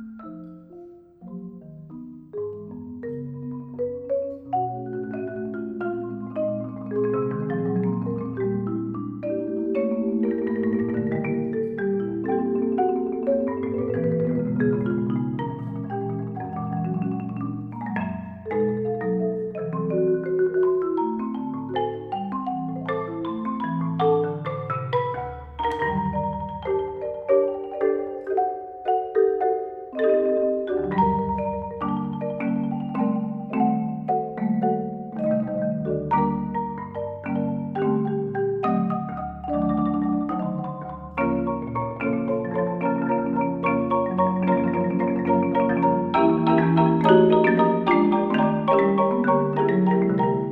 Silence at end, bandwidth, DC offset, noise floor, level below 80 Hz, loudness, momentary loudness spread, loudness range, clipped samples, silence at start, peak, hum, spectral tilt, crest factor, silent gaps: 0 s; 4.9 kHz; under 0.1%; -45 dBFS; -52 dBFS; -24 LUFS; 11 LU; 9 LU; under 0.1%; 0 s; -2 dBFS; none; -10.5 dB/octave; 22 dB; none